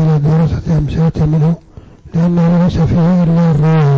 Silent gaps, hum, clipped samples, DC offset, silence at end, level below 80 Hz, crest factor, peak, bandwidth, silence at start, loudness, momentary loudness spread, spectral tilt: none; none; under 0.1%; under 0.1%; 0 s; -28 dBFS; 4 dB; -6 dBFS; 7 kHz; 0 s; -12 LUFS; 5 LU; -9.5 dB/octave